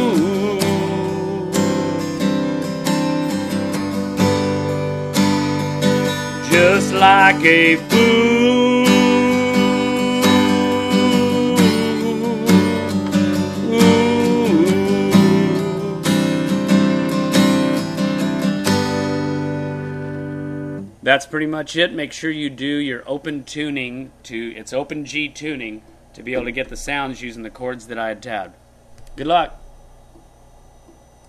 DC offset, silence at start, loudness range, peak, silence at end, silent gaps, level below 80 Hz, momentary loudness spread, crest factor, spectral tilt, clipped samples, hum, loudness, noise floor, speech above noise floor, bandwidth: under 0.1%; 0 s; 13 LU; 0 dBFS; 1.6 s; none; -48 dBFS; 14 LU; 18 dB; -5 dB/octave; under 0.1%; none; -17 LUFS; -47 dBFS; 29 dB; 14 kHz